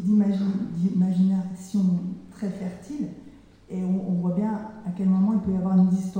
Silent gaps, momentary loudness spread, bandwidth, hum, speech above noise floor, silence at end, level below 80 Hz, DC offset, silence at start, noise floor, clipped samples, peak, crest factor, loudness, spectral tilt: none; 13 LU; 9 kHz; none; 25 dB; 0 s; -56 dBFS; under 0.1%; 0 s; -48 dBFS; under 0.1%; -12 dBFS; 12 dB; -25 LUFS; -9.5 dB/octave